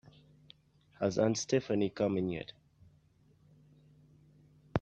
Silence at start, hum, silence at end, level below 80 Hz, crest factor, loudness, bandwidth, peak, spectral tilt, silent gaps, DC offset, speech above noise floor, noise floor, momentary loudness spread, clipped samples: 1 s; none; 0 s; -70 dBFS; 26 dB; -33 LUFS; 9 kHz; -12 dBFS; -5.5 dB/octave; none; under 0.1%; 34 dB; -66 dBFS; 9 LU; under 0.1%